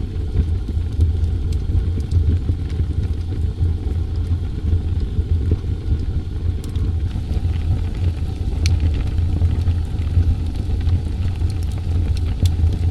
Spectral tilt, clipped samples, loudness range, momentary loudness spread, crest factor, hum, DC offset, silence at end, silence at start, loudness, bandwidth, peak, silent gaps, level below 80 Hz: -7.5 dB/octave; under 0.1%; 2 LU; 5 LU; 16 dB; none; under 0.1%; 0 s; 0 s; -21 LUFS; 8.8 kHz; -4 dBFS; none; -22 dBFS